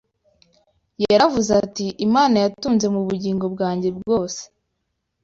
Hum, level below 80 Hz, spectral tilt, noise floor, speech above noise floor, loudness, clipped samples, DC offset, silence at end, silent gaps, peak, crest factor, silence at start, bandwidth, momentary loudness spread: none; -54 dBFS; -5 dB/octave; -75 dBFS; 56 dB; -20 LUFS; under 0.1%; under 0.1%; 0.8 s; none; -4 dBFS; 18 dB; 1 s; 7.8 kHz; 9 LU